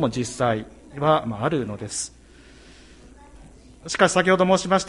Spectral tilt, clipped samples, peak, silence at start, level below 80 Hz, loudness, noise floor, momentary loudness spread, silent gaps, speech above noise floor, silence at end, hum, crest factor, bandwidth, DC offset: -4.5 dB/octave; under 0.1%; -4 dBFS; 0 s; -50 dBFS; -22 LUFS; -48 dBFS; 12 LU; none; 27 dB; 0 s; none; 20 dB; 11.5 kHz; under 0.1%